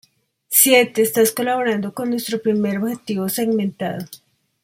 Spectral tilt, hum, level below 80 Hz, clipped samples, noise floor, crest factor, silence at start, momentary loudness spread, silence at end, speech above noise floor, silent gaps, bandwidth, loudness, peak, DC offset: -3.5 dB/octave; none; -66 dBFS; under 0.1%; -43 dBFS; 20 dB; 0.5 s; 12 LU; 0.5 s; 24 dB; none; 16.5 kHz; -18 LUFS; 0 dBFS; under 0.1%